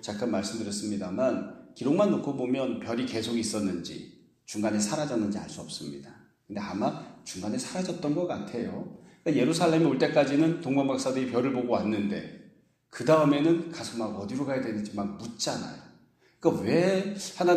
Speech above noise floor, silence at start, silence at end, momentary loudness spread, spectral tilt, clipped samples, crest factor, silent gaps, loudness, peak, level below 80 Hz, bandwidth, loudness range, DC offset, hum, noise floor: 33 dB; 0 s; 0 s; 14 LU; -5.5 dB/octave; under 0.1%; 20 dB; none; -28 LUFS; -8 dBFS; -68 dBFS; 14 kHz; 7 LU; under 0.1%; none; -61 dBFS